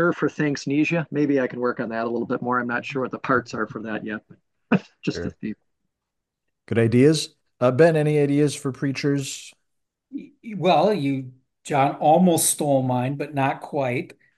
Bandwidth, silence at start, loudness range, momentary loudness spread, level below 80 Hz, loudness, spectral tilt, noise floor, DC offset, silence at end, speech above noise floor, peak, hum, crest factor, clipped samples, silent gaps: 12.5 kHz; 0 s; 7 LU; 16 LU; -66 dBFS; -22 LUFS; -5.5 dB/octave; -82 dBFS; under 0.1%; 0.25 s; 60 dB; -4 dBFS; none; 18 dB; under 0.1%; none